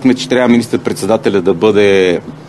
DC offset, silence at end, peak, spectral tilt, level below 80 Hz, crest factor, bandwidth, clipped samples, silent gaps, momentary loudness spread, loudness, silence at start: under 0.1%; 0 s; 0 dBFS; -5.5 dB/octave; -50 dBFS; 12 dB; 12.5 kHz; 0.2%; none; 5 LU; -11 LUFS; 0 s